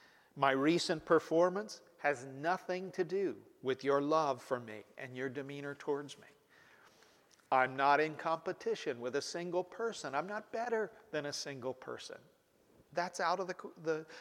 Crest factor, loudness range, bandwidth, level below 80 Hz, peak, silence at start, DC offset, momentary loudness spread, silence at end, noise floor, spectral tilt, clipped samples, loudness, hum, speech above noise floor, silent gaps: 22 dB; 6 LU; 16 kHz; -82 dBFS; -14 dBFS; 0.35 s; under 0.1%; 13 LU; 0 s; -68 dBFS; -4.5 dB/octave; under 0.1%; -36 LUFS; none; 32 dB; none